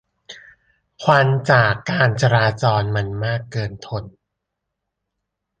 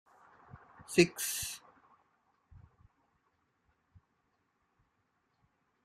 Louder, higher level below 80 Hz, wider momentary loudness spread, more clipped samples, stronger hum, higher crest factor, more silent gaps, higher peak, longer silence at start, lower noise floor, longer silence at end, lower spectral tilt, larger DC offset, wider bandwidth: first, -18 LUFS vs -31 LUFS; first, -48 dBFS vs -70 dBFS; second, 12 LU vs 20 LU; neither; neither; second, 18 dB vs 30 dB; neither; first, -2 dBFS vs -10 dBFS; second, 0.3 s vs 0.55 s; about the same, -79 dBFS vs -78 dBFS; second, 1.5 s vs 4.3 s; first, -6 dB/octave vs -4 dB/octave; neither; second, 9 kHz vs 14 kHz